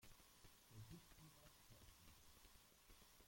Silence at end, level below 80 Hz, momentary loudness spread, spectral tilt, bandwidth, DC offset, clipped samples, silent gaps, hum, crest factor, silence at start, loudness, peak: 0 s; -74 dBFS; 6 LU; -3.5 dB/octave; 16.5 kHz; under 0.1%; under 0.1%; none; none; 18 dB; 0 s; -66 LUFS; -48 dBFS